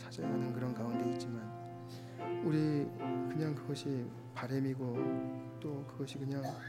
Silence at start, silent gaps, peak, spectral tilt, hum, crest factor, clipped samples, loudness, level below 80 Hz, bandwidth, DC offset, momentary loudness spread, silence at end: 0 s; none; -22 dBFS; -7.5 dB/octave; none; 16 dB; under 0.1%; -39 LUFS; -74 dBFS; 16 kHz; under 0.1%; 10 LU; 0 s